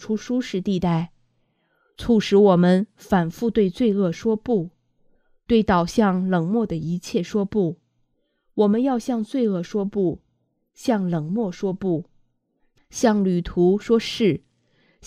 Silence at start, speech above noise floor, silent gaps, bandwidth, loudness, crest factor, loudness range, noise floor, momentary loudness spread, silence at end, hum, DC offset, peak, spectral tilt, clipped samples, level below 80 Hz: 0 s; 50 dB; none; 14 kHz; -22 LUFS; 18 dB; 5 LU; -70 dBFS; 8 LU; 0 s; none; under 0.1%; -4 dBFS; -7 dB/octave; under 0.1%; -48 dBFS